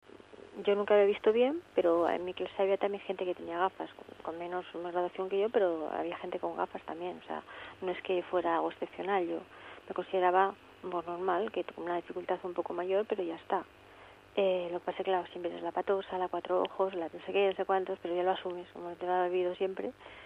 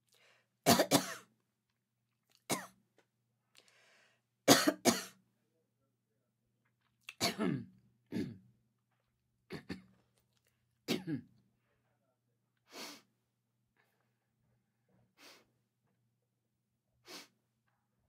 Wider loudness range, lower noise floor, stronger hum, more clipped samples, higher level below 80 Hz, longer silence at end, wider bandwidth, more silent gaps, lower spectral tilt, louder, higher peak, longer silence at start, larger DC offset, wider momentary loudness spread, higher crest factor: second, 5 LU vs 23 LU; second, -55 dBFS vs -85 dBFS; neither; neither; first, -72 dBFS vs -80 dBFS; second, 0 s vs 0.85 s; second, 5.8 kHz vs 16 kHz; neither; first, -6.5 dB/octave vs -3 dB/octave; about the same, -33 LUFS vs -34 LUFS; second, -14 dBFS vs -10 dBFS; second, 0.3 s vs 0.65 s; neither; second, 13 LU vs 25 LU; second, 20 dB vs 32 dB